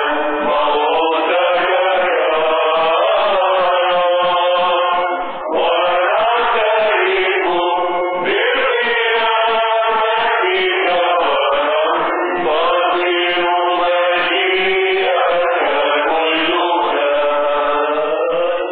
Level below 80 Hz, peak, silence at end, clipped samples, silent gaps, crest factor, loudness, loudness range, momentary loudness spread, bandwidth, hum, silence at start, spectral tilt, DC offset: -52 dBFS; -4 dBFS; 0 s; under 0.1%; none; 10 dB; -15 LUFS; 1 LU; 3 LU; 4.7 kHz; none; 0 s; -8 dB/octave; 0.7%